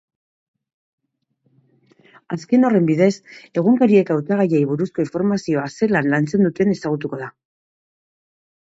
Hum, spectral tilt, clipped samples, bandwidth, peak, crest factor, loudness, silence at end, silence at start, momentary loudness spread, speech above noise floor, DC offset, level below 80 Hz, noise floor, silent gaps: none; -7.5 dB/octave; under 0.1%; 8 kHz; -2 dBFS; 18 dB; -18 LUFS; 1.35 s; 2.3 s; 13 LU; 50 dB; under 0.1%; -62 dBFS; -68 dBFS; none